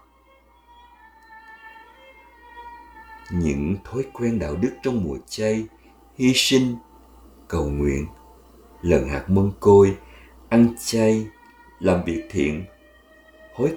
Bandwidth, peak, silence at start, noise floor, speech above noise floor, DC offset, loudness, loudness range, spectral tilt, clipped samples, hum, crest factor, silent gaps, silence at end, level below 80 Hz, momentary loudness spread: 19 kHz; -2 dBFS; 1.3 s; -56 dBFS; 35 dB; under 0.1%; -21 LUFS; 9 LU; -5.5 dB/octave; under 0.1%; none; 20 dB; none; 0 s; -40 dBFS; 24 LU